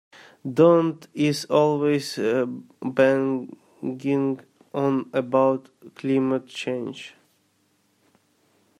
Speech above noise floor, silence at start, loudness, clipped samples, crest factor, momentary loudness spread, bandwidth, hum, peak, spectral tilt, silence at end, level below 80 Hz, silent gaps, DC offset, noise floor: 44 dB; 0.45 s; -23 LUFS; under 0.1%; 18 dB; 15 LU; 15 kHz; none; -6 dBFS; -6.5 dB/octave; 1.7 s; -72 dBFS; none; under 0.1%; -66 dBFS